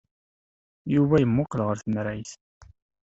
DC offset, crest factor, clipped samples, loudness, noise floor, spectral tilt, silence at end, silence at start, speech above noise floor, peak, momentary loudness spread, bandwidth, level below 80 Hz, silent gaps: under 0.1%; 18 dB; under 0.1%; -24 LUFS; under -90 dBFS; -8 dB/octave; 0.45 s; 0.85 s; over 66 dB; -8 dBFS; 17 LU; 8 kHz; -54 dBFS; 2.41-2.61 s